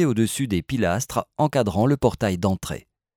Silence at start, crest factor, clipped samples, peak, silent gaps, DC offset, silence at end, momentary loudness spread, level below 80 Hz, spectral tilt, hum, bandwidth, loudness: 0 s; 18 dB; under 0.1%; -6 dBFS; none; under 0.1%; 0.4 s; 7 LU; -46 dBFS; -6 dB/octave; none; 18.5 kHz; -23 LUFS